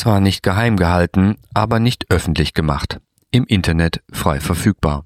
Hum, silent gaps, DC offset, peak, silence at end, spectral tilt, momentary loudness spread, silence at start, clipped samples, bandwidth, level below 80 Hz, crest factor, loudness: none; none; under 0.1%; -2 dBFS; 0 s; -6 dB/octave; 5 LU; 0 s; under 0.1%; 15.5 kHz; -30 dBFS; 16 dB; -17 LUFS